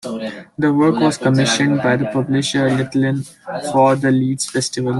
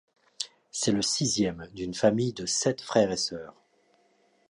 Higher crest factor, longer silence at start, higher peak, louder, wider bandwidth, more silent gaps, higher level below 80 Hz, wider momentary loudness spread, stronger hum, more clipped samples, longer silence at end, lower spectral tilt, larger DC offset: second, 14 dB vs 22 dB; second, 0.05 s vs 0.4 s; first, -2 dBFS vs -8 dBFS; first, -17 LUFS vs -28 LUFS; about the same, 12.5 kHz vs 11.5 kHz; neither; about the same, -56 dBFS vs -60 dBFS; about the same, 11 LU vs 12 LU; neither; neither; second, 0 s vs 1 s; about the same, -5 dB/octave vs -4 dB/octave; neither